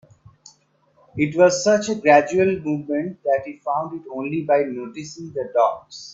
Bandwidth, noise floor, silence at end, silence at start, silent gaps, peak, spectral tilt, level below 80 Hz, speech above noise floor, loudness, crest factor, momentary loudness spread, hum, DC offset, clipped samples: 8 kHz; -60 dBFS; 0 s; 1.15 s; none; 0 dBFS; -5 dB/octave; -62 dBFS; 40 dB; -20 LUFS; 20 dB; 16 LU; none; under 0.1%; under 0.1%